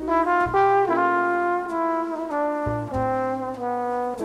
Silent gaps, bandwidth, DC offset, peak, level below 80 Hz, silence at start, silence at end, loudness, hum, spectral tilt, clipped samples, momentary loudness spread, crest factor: none; 12.5 kHz; under 0.1%; -10 dBFS; -48 dBFS; 0 s; 0 s; -23 LUFS; none; -7.5 dB/octave; under 0.1%; 8 LU; 14 dB